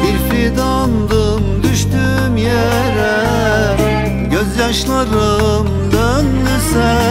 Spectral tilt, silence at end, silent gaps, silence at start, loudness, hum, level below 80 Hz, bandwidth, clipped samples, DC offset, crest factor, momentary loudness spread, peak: -5.5 dB/octave; 0 s; none; 0 s; -14 LUFS; none; -22 dBFS; 16.5 kHz; under 0.1%; under 0.1%; 12 dB; 2 LU; 0 dBFS